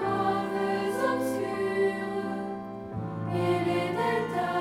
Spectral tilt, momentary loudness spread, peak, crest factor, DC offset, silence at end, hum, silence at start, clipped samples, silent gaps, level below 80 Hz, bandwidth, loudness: -6.5 dB/octave; 8 LU; -14 dBFS; 14 dB; under 0.1%; 0 s; none; 0 s; under 0.1%; none; -62 dBFS; 16 kHz; -29 LUFS